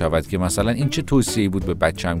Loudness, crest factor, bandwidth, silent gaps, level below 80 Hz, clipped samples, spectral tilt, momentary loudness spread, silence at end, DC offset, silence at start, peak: -21 LUFS; 16 dB; 16 kHz; none; -34 dBFS; under 0.1%; -5.5 dB/octave; 3 LU; 0 s; under 0.1%; 0 s; -4 dBFS